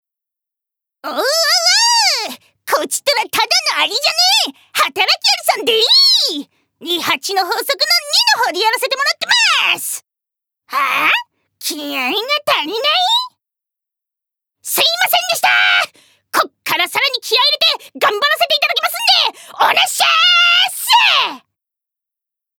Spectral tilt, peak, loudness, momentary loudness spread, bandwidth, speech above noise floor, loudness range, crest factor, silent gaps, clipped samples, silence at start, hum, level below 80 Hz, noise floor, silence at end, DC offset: 1 dB/octave; 0 dBFS; -13 LUFS; 10 LU; over 20 kHz; 70 dB; 4 LU; 16 dB; none; under 0.1%; 1.05 s; none; -76 dBFS; -84 dBFS; 1.2 s; under 0.1%